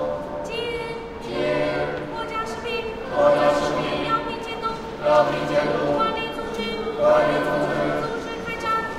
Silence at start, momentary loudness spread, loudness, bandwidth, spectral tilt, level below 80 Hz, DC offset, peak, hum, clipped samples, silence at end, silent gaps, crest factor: 0 s; 10 LU; -23 LUFS; 13.5 kHz; -5.5 dB/octave; -46 dBFS; under 0.1%; -6 dBFS; none; under 0.1%; 0 s; none; 18 dB